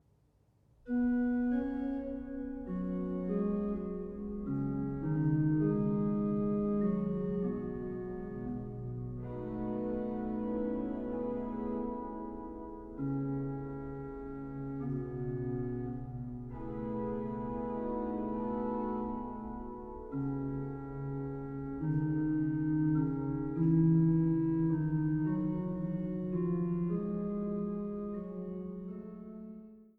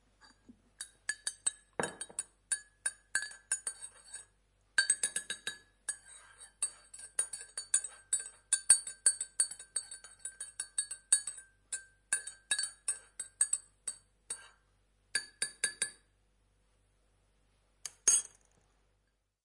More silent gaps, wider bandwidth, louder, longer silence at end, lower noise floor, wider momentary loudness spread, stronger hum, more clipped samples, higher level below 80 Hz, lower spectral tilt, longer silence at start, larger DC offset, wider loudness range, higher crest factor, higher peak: neither; second, 3.1 kHz vs 11.5 kHz; about the same, -35 LUFS vs -34 LUFS; second, 0.1 s vs 1.2 s; second, -69 dBFS vs -78 dBFS; second, 12 LU vs 17 LU; neither; neither; first, -52 dBFS vs -74 dBFS; first, -12.5 dB/octave vs 2 dB/octave; about the same, 0.85 s vs 0.8 s; neither; about the same, 8 LU vs 8 LU; second, 16 dB vs 30 dB; second, -18 dBFS vs -8 dBFS